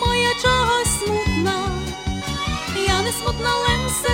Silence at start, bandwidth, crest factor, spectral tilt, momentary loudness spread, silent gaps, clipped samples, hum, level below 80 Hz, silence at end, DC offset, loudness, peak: 0 s; 16.5 kHz; 16 dB; -3.5 dB/octave; 8 LU; none; under 0.1%; none; -30 dBFS; 0 s; under 0.1%; -20 LUFS; -4 dBFS